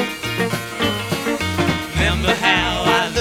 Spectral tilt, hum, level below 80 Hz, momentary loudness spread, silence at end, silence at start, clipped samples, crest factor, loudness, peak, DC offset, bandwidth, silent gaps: -4 dB/octave; none; -32 dBFS; 6 LU; 0 s; 0 s; under 0.1%; 16 dB; -18 LUFS; -2 dBFS; under 0.1%; 19 kHz; none